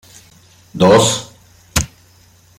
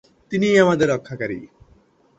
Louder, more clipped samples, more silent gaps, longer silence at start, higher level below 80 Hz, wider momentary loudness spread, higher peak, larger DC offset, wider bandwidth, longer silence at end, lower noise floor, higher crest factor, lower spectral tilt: first, -14 LUFS vs -19 LUFS; neither; neither; first, 0.75 s vs 0.3 s; first, -38 dBFS vs -56 dBFS; first, 16 LU vs 13 LU; about the same, 0 dBFS vs -2 dBFS; neither; first, 16.5 kHz vs 8.2 kHz; about the same, 0.7 s vs 0.75 s; second, -49 dBFS vs -56 dBFS; about the same, 18 dB vs 20 dB; second, -4 dB/octave vs -6 dB/octave